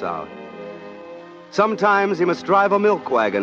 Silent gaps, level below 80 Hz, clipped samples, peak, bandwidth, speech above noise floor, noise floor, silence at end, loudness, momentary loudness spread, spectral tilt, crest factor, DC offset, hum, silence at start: none; -66 dBFS; under 0.1%; -4 dBFS; 7.6 kHz; 20 dB; -39 dBFS; 0 s; -18 LUFS; 20 LU; -6 dB/octave; 16 dB; under 0.1%; none; 0 s